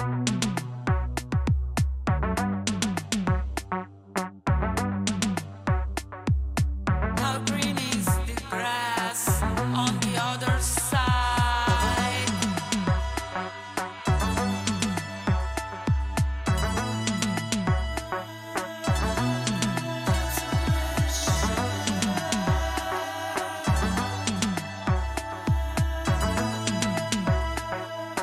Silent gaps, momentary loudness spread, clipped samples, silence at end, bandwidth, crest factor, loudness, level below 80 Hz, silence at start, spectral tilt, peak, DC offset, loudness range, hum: none; 7 LU; under 0.1%; 0 s; 16 kHz; 18 dB; -27 LUFS; -34 dBFS; 0 s; -4.5 dB/octave; -8 dBFS; under 0.1%; 3 LU; none